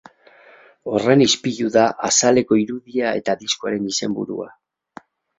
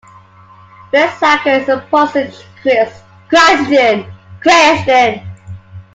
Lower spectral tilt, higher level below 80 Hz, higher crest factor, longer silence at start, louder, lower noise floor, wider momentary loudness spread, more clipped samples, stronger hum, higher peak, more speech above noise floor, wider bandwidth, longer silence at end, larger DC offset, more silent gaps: about the same, -3.5 dB/octave vs -3.5 dB/octave; second, -60 dBFS vs -50 dBFS; first, 20 dB vs 12 dB; about the same, 0.85 s vs 0.95 s; second, -19 LUFS vs -11 LUFS; first, -49 dBFS vs -41 dBFS; second, 12 LU vs 19 LU; neither; neither; about the same, 0 dBFS vs 0 dBFS; about the same, 31 dB vs 30 dB; second, 8.4 kHz vs 9.4 kHz; first, 0.9 s vs 0.15 s; neither; neither